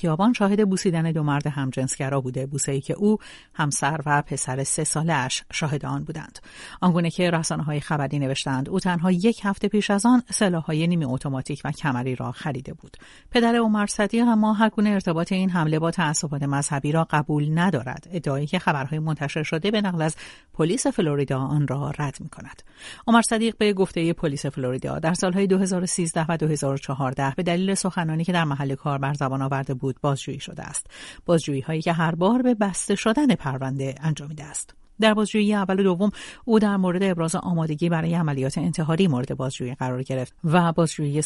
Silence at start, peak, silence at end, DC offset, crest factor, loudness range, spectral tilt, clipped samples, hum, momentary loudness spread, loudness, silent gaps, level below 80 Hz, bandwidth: 0 s; -4 dBFS; 0 s; under 0.1%; 18 dB; 3 LU; -5.5 dB/octave; under 0.1%; none; 10 LU; -23 LUFS; none; -52 dBFS; 11.5 kHz